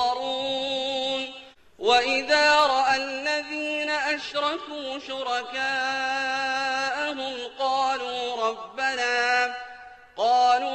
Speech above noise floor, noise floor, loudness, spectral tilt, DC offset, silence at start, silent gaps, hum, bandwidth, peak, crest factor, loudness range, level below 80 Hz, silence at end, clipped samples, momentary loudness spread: 19 dB; -46 dBFS; -24 LUFS; -1 dB/octave; under 0.1%; 0 s; none; none; 8.8 kHz; -8 dBFS; 18 dB; 4 LU; -62 dBFS; 0 s; under 0.1%; 12 LU